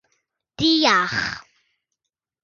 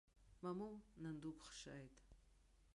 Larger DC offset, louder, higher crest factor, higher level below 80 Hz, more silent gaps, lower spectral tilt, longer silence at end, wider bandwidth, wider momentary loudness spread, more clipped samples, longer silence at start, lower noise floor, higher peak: neither; first, -19 LUFS vs -54 LUFS; about the same, 22 dB vs 18 dB; first, -56 dBFS vs -72 dBFS; neither; second, -3 dB/octave vs -5.5 dB/octave; first, 1 s vs 0.05 s; second, 7.2 kHz vs 11.5 kHz; first, 13 LU vs 9 LU; neither; first, 0.6 s vs 0.15 s; first, -83 dBFS vs -73 dBFS; first, -2 dBFS vs -38 dBFS